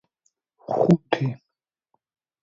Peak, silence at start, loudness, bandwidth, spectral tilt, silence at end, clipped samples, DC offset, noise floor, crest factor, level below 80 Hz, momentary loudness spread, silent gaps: -4 dBFS; 0.7 s; -23 LUFS; 7.4 kHz; -8.5 dB/octave; 1.05 s; under 0.1%; under 0.1%; -85 dBFS; 22 dB; -62 dBFS; 22 LU; none